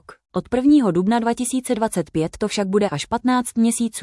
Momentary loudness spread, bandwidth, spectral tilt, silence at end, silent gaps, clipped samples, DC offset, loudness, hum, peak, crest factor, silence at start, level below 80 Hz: 8 LU; 12 kHz; -5 dB/octave; 0 s; none; under 0.1%; under 0.1%; -20 LUFS; none; -6 dBFS; 14 dB; 0.1 s; -50 dBFS